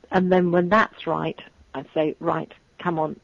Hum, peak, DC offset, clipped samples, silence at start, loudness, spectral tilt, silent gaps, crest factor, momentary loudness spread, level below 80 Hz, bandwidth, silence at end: none; -6 dBFS; under 0.1%; under 0.1%; 0.1 s; -23 LUFS; -8 dB/octave; none; 18 dB; 18 LU; -56 dBFS; 7.2 kHz; 0.1 s